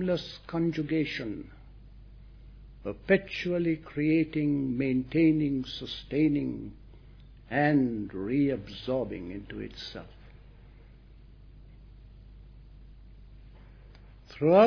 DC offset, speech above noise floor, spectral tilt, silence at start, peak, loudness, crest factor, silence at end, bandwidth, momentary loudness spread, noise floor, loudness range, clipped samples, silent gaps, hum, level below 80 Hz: under 0.1%; 24 dB; -8 dB/octave; 0 s; -8 dBFS; -29 LUFS; 22 dB; 0 s; 5.4 kHz; 16 LU; -52 dBFS; 11 LU; under 0.1%; none; none; -52 dBFS